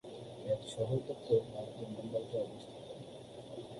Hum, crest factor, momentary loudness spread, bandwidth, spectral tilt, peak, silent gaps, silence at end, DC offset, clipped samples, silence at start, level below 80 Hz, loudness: none; 22 dB; 16 LU; 11.5 kHz; -7 dB/octave; -18 dBFS; none; 0 s; under 0.1%; under 0.1%; 0.05 s; -68 dBFS; -39 LUFS